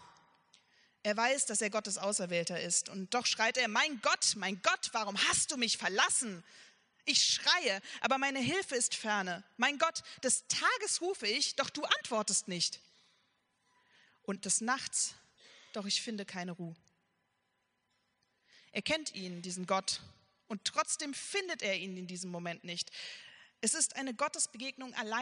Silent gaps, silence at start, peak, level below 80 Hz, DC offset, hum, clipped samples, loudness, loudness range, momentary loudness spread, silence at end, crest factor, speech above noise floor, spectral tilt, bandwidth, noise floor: none; 0 s; -12 dBFS; -76 dBFS; under 0.1%; none; under 0.1%; -33 LUFS; 8 LU; 12 LU; 0 s; 24 dB; 46 dB; -1 dB/octave; 10.5 kHz; -80 dBFS